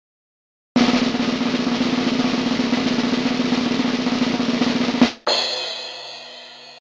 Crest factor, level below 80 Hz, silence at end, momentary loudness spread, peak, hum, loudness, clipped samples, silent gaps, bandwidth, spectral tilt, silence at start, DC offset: 20 dB; -52 dBFS; 0 s; 13 LU; 0 dBFS; none; -20 LUFS; under 0.1%; none; 8 kHz; -4.5 dB/octave; 0.75 s; under 0.1%